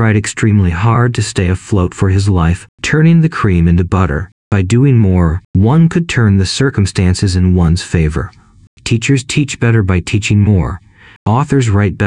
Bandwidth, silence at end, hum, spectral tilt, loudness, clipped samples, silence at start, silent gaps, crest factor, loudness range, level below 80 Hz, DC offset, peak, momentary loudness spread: 10.5 kHz; 0 s; none; -6.5 dB/octave; -12 LUFS; under 0.1%; 0 s; 2.69-2.78 s, 4.32-4.51 s, 5.45-5.54 s, 8.67-8.77 s, 11.16-11.26 s; 10 dB; 2 LU; -28 dBFS; under 0.1%; 0 dBFS; 7 LU